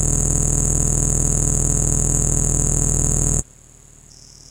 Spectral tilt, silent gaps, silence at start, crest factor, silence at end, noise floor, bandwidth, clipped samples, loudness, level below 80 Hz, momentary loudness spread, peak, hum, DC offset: -5 dB/octave; none; 0 s; 18 dB; 1.1 s; -46 dBFS; 17 kHz; under 0.1%; -17 LUFS; -24 dBFS; 1 LU; -2 dBFS; none; under 0.1%